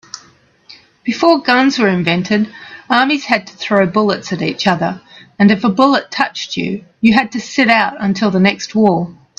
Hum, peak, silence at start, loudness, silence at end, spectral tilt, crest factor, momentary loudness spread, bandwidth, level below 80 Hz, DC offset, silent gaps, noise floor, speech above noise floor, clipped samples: none; 0 dBFS; 0.15 s; -14 LUFS; 0.25 s; -5.5 dB/octave; 14 dB; 10 LU; 8 kHz; -54 dBFS; under 0.1%; none; -49 dBFS; 35 dB; under 0.1%